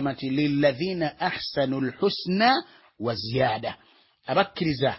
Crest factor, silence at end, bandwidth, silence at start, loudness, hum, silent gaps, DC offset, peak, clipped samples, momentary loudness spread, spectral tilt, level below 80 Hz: 18 dB; 0 s; 5.8 kHz; 0 s; -25 LUFS; none; none; under 0.1%; -8 dBFS; under 0.1%; 9 LU; -9.5 dB/octave; -56 dBFS